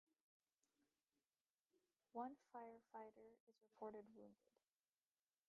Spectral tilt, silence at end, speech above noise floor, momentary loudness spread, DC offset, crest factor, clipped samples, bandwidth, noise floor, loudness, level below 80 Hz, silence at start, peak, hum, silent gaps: -5.5 dB/octave; 1.15 s; over 31 dB; 10 LU; under 0.1%; 22 dB; under 0.1%; 6.2 kHz; under -90 dBFS; -59 LUFS; under -90 dBFS; 2.15 s; -40 dBFS; none; 3.40-3.47 s